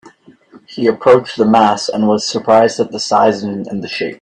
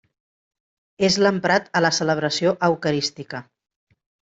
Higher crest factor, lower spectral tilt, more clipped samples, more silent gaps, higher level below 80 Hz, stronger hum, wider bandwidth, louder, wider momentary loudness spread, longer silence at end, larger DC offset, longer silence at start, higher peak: about the same, 14 dB vs 18 dB; about the same, -5 dB/octave vs -4 dB/octave; neither; neither; first, -56 dBFS vs -62 dBFS; neither; first, 9.8 kHz vs 8.2 kHz; first, -13 LUFS vs -20 LUFS; about the same, 11 LU vs 12 LU; second, 0.05 s vs 0.9 s; neither; second, 0.05 s vs 1 s; first, 0 dBFS vs -6 dBFS